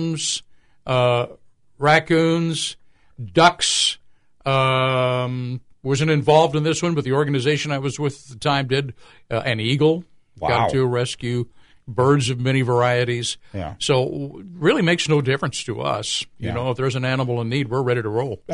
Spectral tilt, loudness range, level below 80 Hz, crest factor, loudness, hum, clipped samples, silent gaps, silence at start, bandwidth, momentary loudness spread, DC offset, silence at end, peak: -5 dB/octave; 3 LU; -52 dBFS; 18 dB; -20 LUFS; none; under 0.1%; none; 0 s; 11 kHz; 12 LU; under 0.1%; 0 s; -2 dBFS